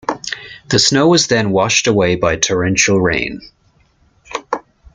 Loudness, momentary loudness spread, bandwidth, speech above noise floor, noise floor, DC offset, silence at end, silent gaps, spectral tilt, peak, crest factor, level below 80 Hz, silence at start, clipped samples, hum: -14 LUFS; 15 LU; 10.5 kHz; 41 dB; -55 dBFS; under 0.1%; 0.35 s; none; -3.5 dB/octave; 0 dBFS; 16 dB; -44 dBFS; 0.1 s; under 0.1%; none